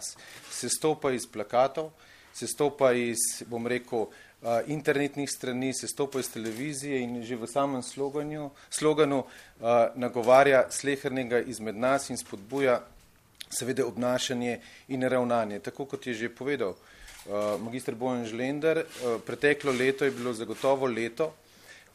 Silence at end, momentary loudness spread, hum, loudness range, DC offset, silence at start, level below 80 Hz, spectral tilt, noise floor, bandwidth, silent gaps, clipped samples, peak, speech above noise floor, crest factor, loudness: 0.15 s; 12 LU; none; 6 LU; under 0.1%; 0 s; -66 dBFS; -4 dB/octave; -53 dBFS; 15 kHz; none; under 0.1%; -6 dBFS; 25 dB; 22 dB; -29 LUFS